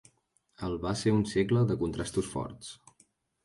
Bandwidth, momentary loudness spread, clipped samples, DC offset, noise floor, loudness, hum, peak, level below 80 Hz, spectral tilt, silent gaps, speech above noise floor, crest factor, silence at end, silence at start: 11.5 kHz; 16 LU; under 0.1%; under 0.1%; -72 dBFS; -30 LUFS; none; -14 dBFS; -52 dBFS; -6.5 dB/octave; none; 42 dB; 18 dB; 0.7 s; 0.6 s